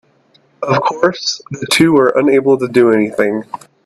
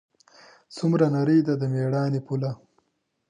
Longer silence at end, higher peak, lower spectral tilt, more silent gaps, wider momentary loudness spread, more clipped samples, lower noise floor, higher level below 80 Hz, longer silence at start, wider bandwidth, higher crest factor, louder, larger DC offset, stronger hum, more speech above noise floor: second, 0.3 s vs 0.75 s; first, 0 dBFS vs -8 dBFS; second, -5 dB/octave vs -8.5 dB/octave; neither; about the same, 12 LU vs 11 LU; neither; second, -53 dBFS vs -74 dBFS; first, -56 dBFS vs -70 dBFS; about the same, 0.6 s vs 0.7 s; first, 13.5 kHz vs 9.8 kHz; about the same, 14 dB vs 18 dB; first, -13 LUFS vs -24 LUFS; neither; neither; second, 40 dB vs 51 dB